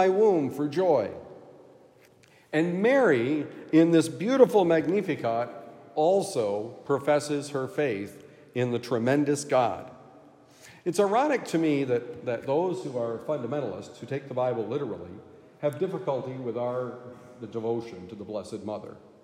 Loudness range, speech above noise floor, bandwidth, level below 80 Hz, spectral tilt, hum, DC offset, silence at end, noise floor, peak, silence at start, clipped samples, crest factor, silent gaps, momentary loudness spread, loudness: 9 LU; 31 dB; 16 kHz; -76 dBFS; -6 dB/octave; none; under 0.1%; 0.25 s; -58 dBFS; -6 dBFS; 0 s; under 0.1%; 22 dB; none; 16 LU; -27 LUFS